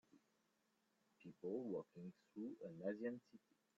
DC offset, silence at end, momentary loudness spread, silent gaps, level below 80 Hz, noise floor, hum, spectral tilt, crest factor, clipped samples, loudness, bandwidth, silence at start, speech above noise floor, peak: under 0.1%; 0.4 s; 12 LU; none; under -90 dBFS; -84 dBFS; none; -8 dB/octave; 18 dB; under 0.1%; -51 LUFS; 7.4 kHz; 0.15 s; 34 dB; -34 dBFS